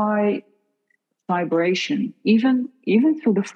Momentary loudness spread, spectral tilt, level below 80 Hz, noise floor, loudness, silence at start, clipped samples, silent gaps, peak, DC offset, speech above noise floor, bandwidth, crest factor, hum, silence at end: 7 LU; -6.5 dB/octave; -78 dBFS; -70 dBFS; -21 LUFS; 0 s; under 0.1%; none; -6 dBFS; under 0.1%; 51 dB; 8 kHz; 14 dB; none; 0.05 s